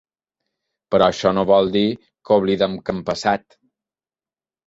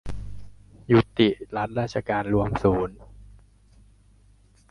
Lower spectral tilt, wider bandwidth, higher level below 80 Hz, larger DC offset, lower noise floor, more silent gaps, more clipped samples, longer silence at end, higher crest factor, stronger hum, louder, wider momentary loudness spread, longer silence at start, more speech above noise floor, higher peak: second, -6 dB/octave vs -7.5 dB/octave; second, 8 kHz vs 11 kHz; second, -52 dBFS vs -44 dBFS; neither; first, under -90 dBFS vs -57 dBFS; neither; neither; second, 1.3 s vs 1.45 s; about the same, 18 dB vs 20 dB; second, none vs 50 Hz at -40 dBFS; first, -19 LUFS vs -24 LUFS; second, 9 LU vs 15 LU; first, 0.9 s vs 0.05 s; first, over 72 dB vs 34 dB; first, -2 dBFS vs -6 dBFS